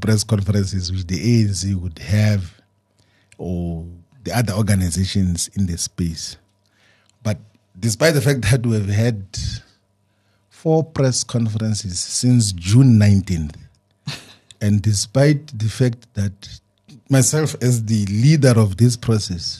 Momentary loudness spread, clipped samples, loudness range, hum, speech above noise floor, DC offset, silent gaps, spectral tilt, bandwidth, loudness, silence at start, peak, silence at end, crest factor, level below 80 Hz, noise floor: 14 LU; under 0.1%; 5 LU; none; 46 dB; under 0.1%; none; -5.5 dB/octave; 13 kHz; -18 LUFS; 0 s; -2 dBFS; 0 s; 18 dB; -42 dBFS; -63 dBFS